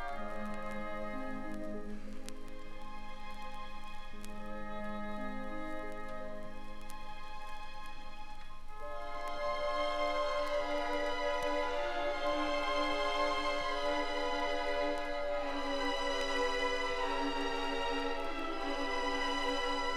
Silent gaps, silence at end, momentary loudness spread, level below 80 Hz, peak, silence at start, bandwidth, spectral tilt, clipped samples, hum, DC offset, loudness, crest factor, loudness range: none; 0 s; 15 LU; -44 dBFS; -20 dBFS; 0 s; 11.5 kHz; -3.5 dB/octave; under 0.1%; none; under 0.1%; -36 LUFS; 16 dB; 12 LU